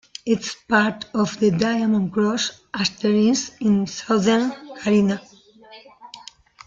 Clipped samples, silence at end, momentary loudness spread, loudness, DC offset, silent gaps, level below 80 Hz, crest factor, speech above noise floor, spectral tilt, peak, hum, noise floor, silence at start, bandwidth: under 0.1%; 0.45 s; 9 LU; -21 LUFS; under 0.1%; none; -58 dBFS; 18 dB; 27 dB; -5 dB/octave; -4 dBFS; none; -47 dBFS; 0.25 s; 7.6 kHz